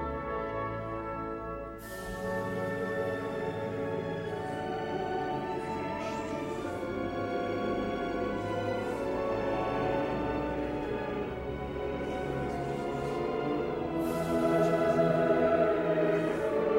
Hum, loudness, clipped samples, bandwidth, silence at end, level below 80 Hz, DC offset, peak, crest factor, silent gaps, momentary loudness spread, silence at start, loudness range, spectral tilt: none; -32 LUFS; under 0.1%; 16 kHz; 0 s; -50 dBFS; under 0.1%; -14 dBFS; 18 dB; none; 9 LU; 0 s; 7 LU; -7 dB/octave